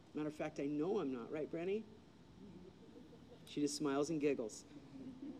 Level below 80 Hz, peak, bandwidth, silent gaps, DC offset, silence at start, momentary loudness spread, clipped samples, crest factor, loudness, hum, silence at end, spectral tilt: -74 dBFS; -26 dBFS; 13 kHz; none; under 0.1%; 0 s; 21 LU; under 0.1%; 18 dB; -41 LUFS; none; 0 s; -5 dB/octave